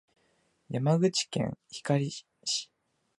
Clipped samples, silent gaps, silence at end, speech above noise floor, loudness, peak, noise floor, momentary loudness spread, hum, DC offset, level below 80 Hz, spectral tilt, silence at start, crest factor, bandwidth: under 0.1%; none; 0.55 s; 42 dB; -30 LUFS; -12 dBFS; -71 dBFS; 12 LU; none; under 0.1%; -68 dBFS; -5 dB/octave; 0.7 s; 20 dB; 11.5 kHz